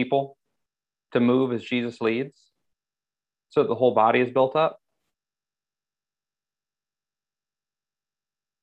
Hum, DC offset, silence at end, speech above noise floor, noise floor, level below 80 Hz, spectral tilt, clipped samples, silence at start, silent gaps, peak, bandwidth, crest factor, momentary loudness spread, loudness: 50 Hz at -65 dBFS; under 0.1%; 3.9 s; over 68 dB; under -90 dBFS; -74 dBFS; -7.5 dB/octave; under 0.1%; 0 s; none; -6 dBFS; 8 kHz; 22 dB; 9 LU; -23 LUFS